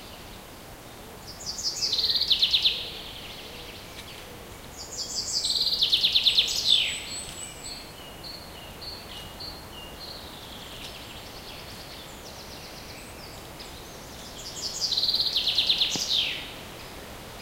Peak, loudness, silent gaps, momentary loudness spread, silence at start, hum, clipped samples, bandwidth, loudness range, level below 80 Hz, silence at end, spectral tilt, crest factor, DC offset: -8 dBFS; -23 LUFS; none; 21 LU; 0 s; none; under 0.1%; 16 kHz; 17 LU; -52 dBFS; 0 s; -0.5 dB/octave; 22 dB; under 0.1%